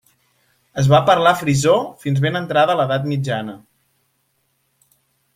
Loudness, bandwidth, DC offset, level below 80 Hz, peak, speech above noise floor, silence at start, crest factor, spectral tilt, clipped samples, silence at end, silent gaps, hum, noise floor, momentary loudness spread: -17 LUFS; 16 kHz; under 0.1%; -54 dBFS; -2 dBFS; 50 dB; 0.75 s; 18 dB; -5.5 dB/octave; under 0.1%; 1.8 s; none; none; -67 dBFS; 10 LU